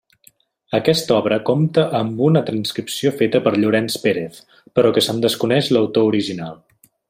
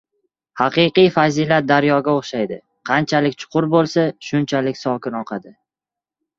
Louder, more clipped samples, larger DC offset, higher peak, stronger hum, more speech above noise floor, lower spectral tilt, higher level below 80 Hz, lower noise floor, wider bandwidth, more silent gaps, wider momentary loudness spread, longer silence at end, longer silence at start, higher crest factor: about the same, -18 LUFS vs -18 LUFS; neither; neither; about the same, -2 dBFS vs -2 dBFS; neither; second, 37 dB vs 71 dB; about the same, -5.5 dB/octave vs -6 dB/octave; about the same, -58 dBFS vs -60 dBFS; second, -55 dBFS vs -88 dBFS; first, 16 kHz vs 7.6 kHz; neither; second, 7 LU vs 12 LU; second, 0.55 s vs 0.9 s; first, 0.7 s vs 0.55 s; about the same, 16 dB vs 16 dB